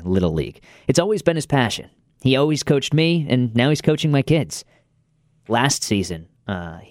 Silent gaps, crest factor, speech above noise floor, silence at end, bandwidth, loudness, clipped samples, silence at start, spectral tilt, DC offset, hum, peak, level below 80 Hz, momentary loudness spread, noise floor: none; 20 dB; 43 dB; 0.05 s; 16 kHz; -20 LUFS; under 0.1%; 0 s; -5 dB/octave; under 0.1%; none; 0 dBFS; -46 dBFS; 11 LU; -62 dBFS